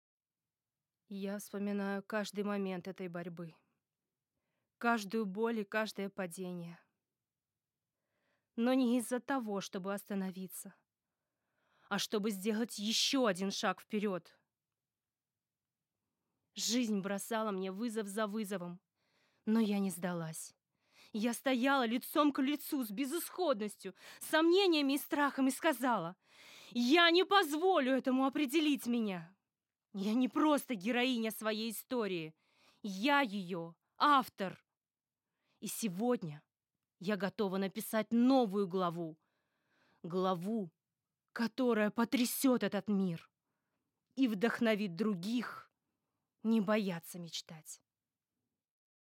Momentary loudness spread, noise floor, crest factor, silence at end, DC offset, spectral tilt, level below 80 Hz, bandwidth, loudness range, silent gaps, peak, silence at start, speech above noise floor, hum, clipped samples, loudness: 16 LU; under -90 dBFS; 22 dB; 1.35 s; under 0.1%; -4.5 dB/octave; under -90 dBFS; 16.5 kHz; 9 LU; none; -14 dBFS; 1.1 s; over 55 dB; none; under 0.1%; -35 LUFS